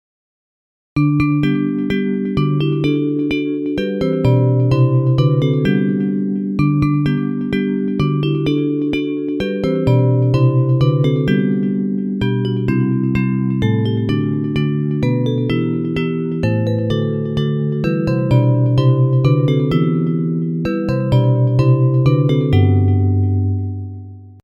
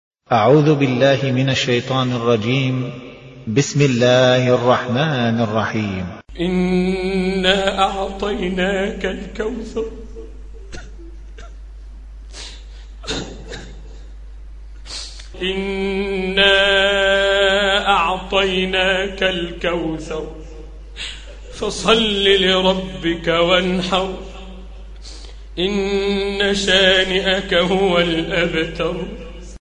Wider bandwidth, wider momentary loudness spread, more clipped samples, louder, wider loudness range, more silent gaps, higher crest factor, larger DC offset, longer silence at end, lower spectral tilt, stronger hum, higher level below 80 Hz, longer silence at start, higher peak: second, 6.4 kHz vs 10.5 kHz; second, 6 LU vs 23 LU; neither; about the same, -16 LUFS vs -17 LUFS; second, 3 LU vs 16 LU; neither; about the same, 14 dB vs 18 dB; neither; about the same, 0.1 s vs 0.05 s; first, -9.5 dB/octave vs -5 dB/octave; neither; about the same, -40 dBFS vs -36 dBFS; first, 0.95 s vs 0.3 s; about the same, -2 dBFS vs 0 dBFS